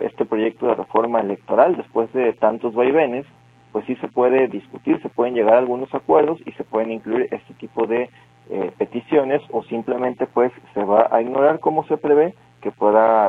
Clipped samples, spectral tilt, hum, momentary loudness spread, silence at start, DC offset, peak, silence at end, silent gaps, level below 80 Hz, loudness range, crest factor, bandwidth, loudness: under 0.1%; -8.5 dB/octave; none; 11 LU; 0 s; under 0.1%; 0 dBFS; 0 s; none; -64 dBFS; 4 LU; 18 dB; 4 kHz; -20 LUFS